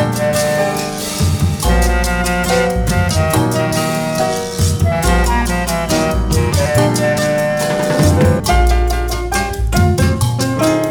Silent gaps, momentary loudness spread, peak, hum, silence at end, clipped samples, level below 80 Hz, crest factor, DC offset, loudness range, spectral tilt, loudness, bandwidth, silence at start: none; 4 LU; 0 dBFS; none; 0 s; under 0.1%; -20 dBFS; 14 dB; under 0.1%; 1 LU; -5 dB/octave; -15 LUFS; 19.5 kHz; 0 s